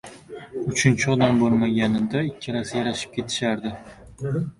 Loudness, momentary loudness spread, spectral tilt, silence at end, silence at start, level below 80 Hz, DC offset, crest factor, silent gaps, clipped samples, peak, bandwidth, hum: -23 LUFS; 14 LU; -5.5 dB/octave; 0.05 s; 0.05 s; -52 dBFS; under 0.1%; 20 dB; none; under 0.1%; -4 dBFS; 11.5 kHz; none